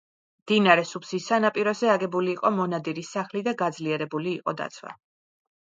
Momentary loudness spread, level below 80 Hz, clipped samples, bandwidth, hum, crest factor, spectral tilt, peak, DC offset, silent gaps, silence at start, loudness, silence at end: 11 LU; -76 dBFS; under 0.1%; 9 kHz; none; 24 dB; -5 dB/octave; -2 dBFS; under 0.1%; none; 0.45 s; -25 LUFS; 0.7 s